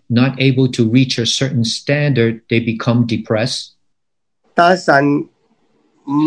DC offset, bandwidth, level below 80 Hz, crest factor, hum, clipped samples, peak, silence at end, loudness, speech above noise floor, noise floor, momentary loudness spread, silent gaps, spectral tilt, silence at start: under 0.1%; 10.5 kHz; -58 dBFS; 16 dB; none; under 0.1%; 0 dBFS; 0 s; -15 LUFS; 66 dB; -80 dBFS; 9 LU; none; -5.5 dB/octave; 0.1 s